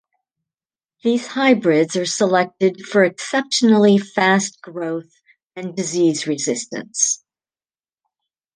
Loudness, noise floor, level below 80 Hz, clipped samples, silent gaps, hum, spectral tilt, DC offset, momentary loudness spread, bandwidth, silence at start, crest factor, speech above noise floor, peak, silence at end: -18 LUFS; under -90 dBFS; -70 dBFS; under 0.1%; 5.46-5.50 s; none; -4 dB/octave; under 0.1%; 12 LU; 10 kHz; 1.05 s; 18 dB; over 72 dB; -2 dBFS; 1.4 s